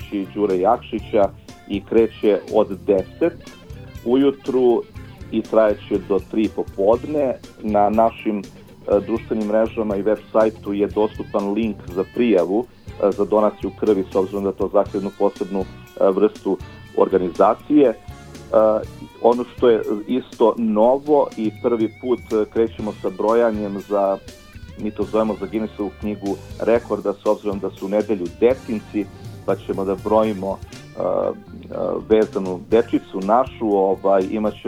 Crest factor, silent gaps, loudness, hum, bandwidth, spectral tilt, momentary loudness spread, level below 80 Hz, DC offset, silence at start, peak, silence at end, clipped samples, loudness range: 20 dB; none; -20 LUFS; none; 15 kHz; -7.5 dB/octave; 10 LU; -46 dBFS; under 0.1%; 0 s; 0 dBFS; 0 s; under 0.1%; 4 LU